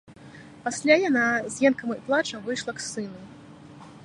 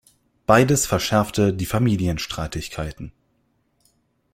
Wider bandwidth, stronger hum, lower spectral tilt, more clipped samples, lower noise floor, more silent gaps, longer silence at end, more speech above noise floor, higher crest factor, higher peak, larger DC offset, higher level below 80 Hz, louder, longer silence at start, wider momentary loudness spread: second, 11.5 kHz vs 16.5 kHz; neither; second, -3.5 dB/octave vs -5 dB/octave; neither; second, -46 dBFS vs -67 dBFS; neither; second, 0.05 s vs 1.25 s; second, 22 dB vs 47 dB; about the same, 22 dB vs 20 dB; second, -6 dBFS vs -2 dBFS; neither; second, -66 dBFS vs -42 dBFS; second, -25 LUFS vs -21 LUFS; second, 0.1 s vs 0.5 s; about the same, 15 LU vs 15 LU